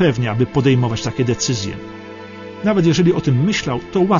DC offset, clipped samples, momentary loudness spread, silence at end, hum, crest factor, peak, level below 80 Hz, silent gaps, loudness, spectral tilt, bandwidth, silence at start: under 0.1%; under 0.1%; 18 LU; 0 s; none; 14 dB; -4 dBFS; -44 dBFS; none; -17 LUFS; -6 dB/octave; 7.4 kHz; 0 s